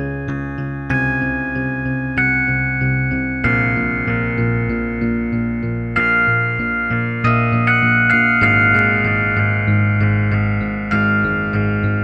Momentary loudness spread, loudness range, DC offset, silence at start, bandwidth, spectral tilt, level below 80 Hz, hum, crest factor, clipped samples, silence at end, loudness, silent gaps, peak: 8 LU; 4 LU; under 0.1%; 0 s; 5.6 kHz; -9 dB/octave; -34 dBFS; none; 14 dB; under 0.1%; 0 s; -17 LUFS; none; -2 dBFS